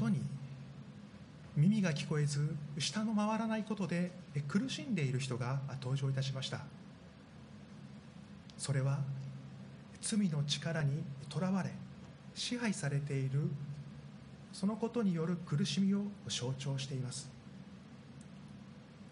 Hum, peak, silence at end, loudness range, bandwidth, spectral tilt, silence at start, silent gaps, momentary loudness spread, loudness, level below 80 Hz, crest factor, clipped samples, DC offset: none; -20 dBFS; 0 s; 6 LU; 10.5 kHz; -5.5 dB/octave; 0 s; none; 19 LU; -37 LUFS; -70 dBFS; 18 dB; under 0.1%; under 0.1%